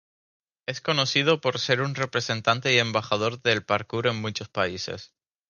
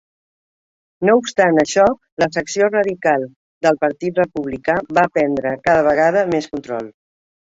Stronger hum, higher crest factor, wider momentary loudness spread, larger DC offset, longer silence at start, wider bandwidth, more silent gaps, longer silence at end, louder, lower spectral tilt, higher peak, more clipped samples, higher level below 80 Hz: neither; first, 22 dB vs 16 dB; about the same, 11 LU vs 9 LU; neither; second, 0.7 s vs 1 s; first, 9.8 kHz vs 8 kHz; second, none vs 2.12-2.17 s, 3.36-3.61 s; second, 0.45 s vs 0.7 s; second, -25 LUFS vs -17 LUFS; about the same, -4 dB/octave vs -5 dB/octave; second, -4 dBFS vs 0 dBFS; neither; second, -60 dBFS vs -54 dBFS